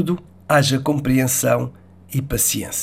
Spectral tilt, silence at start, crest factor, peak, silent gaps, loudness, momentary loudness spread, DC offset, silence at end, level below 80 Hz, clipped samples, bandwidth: -4 dB/octave; 0 s; 16 dB; -2 dBFS; none; -19 LUFS; 11 LU; 0.2%; 0 s; -42 dBFS; under 0.1%; 16.5 kHz